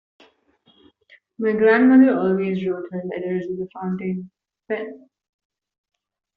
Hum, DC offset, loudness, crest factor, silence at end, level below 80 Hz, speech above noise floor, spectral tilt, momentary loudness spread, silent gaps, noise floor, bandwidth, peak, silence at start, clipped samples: none; under 0.1%; -20 LUFS; 18 dB; 1.4 s; -66 dBFS; 41 dB; -6.5 dB/octave; 16 LU; none; -60 dBFS; 4.7 kHz; -4 dBFS; 1.4 s; under 0.1%